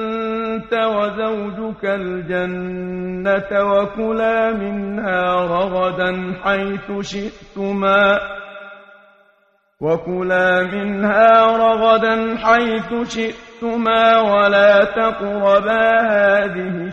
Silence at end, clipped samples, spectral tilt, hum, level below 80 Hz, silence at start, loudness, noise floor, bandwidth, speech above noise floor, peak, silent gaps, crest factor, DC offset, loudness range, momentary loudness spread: 0 s; under 0.1%; -6 dB/octave; none; -48 dBFS; 0 s; -17 LUFS; -60 dBFS; 7.8 kHz; 43 dB; -2 dBFS; none; 16 dB; under 0.1%; 6 LU; 13 LU